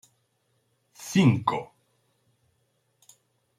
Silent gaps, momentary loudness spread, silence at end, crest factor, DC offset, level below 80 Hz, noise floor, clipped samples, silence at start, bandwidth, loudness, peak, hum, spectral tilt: none; 22 LU; 1.95 s; 22 dB; under 0.1%; -68 dBFS; -72 dBFS; under 0.1%; 1 s; 15.5 kHz; -24 LUFS; -8 dBFS; none; -6 dB/octave